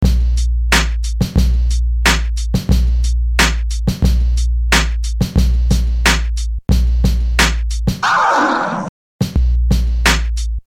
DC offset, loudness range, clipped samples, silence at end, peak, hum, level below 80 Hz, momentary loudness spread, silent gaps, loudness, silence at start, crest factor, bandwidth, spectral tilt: under 0.1%; 1 LU; under 0.1%; 0.05 s; 0 dBFS; none; -16 dBFS; 6 LU; 8.89-9.19 s; -16 LUFS; 0 s; 14 dB; 15.5 kHz; -4.5 dB/octave